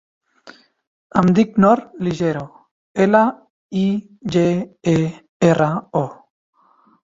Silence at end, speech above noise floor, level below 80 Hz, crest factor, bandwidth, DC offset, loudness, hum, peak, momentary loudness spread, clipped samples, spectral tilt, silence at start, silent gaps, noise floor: 0.9 s; 39 dB; -54 dBFS; 18 dB; 7.8 kHz; under 0.1%; -18 LUFS; none; -2 dBFS; 11 LU; under 0.1%; -7.5 dB/octave; 0.45 s; 0.87-1.10 s, 2.71-2.94 s, 3.50-3.69 s, 5.29-5.40 s; -56 dBFS